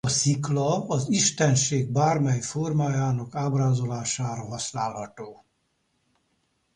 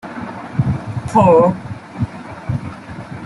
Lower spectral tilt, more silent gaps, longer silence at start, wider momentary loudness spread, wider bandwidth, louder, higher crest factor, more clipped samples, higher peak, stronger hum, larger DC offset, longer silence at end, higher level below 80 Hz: second, -4.5 dB/octave vs -8.5 dB/octave; neither; about the same, 0.05 s vs 0.05 s; second, 10 LU vs 20 LU; about the same, 11 kHz vs 11.5 kHz; second, -25 LUFS vs -17 LUFS; about the same, 16 dB vs 16 dB; neither; second, -10 dBFS vs -2 dBFS; neither; neither; first, 1.4 s vs 0 s; second, -58 dBFS vs -42 dBFS